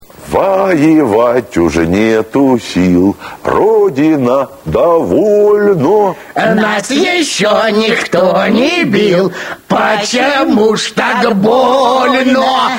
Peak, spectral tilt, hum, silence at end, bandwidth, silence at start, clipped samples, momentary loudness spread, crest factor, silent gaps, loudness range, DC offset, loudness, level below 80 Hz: 0 dBFS; -5 dB/octave; none; 0 s; 16.5 kHz; 0.2 s; under 0.1%; 4 LU; 10 dB; none; 1 LU; under 0.1%; -10 LUFS; -40 dBFS